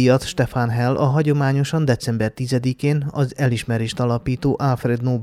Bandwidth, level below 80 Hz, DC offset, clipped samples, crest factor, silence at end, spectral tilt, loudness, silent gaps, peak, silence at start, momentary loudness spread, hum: 13.5 kHz; -46 dBFS; under 0.1%; under 0.1%; 16 dB; 0 s; -7 dB/octave; -20 LUFS; none; -4 dBFS; 0 s; 4 LU; none